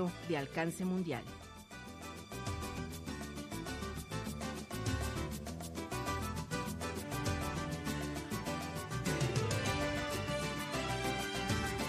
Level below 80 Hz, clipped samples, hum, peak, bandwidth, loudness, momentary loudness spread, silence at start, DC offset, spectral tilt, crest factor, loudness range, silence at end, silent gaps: -50 dBFS; under 0.1%; none; -22 dBFS; 15 kHz; -39 LUFS; 9 LU; 0 s; under 0.1%; -4.5 dB/octave; 18 dB; 6 LU; 0 s; none